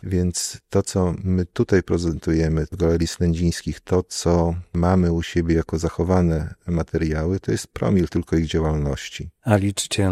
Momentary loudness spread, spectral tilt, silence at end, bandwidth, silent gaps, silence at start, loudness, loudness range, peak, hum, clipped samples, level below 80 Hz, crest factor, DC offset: 6 LU; -6 dB/octave; 0 s; 14.5 kHz; none; 0.05 s; -22 LUFS; 1 LU; -4 dBFS; none; under 0.1%; -38 dBFS; 16 dB; under 0.1%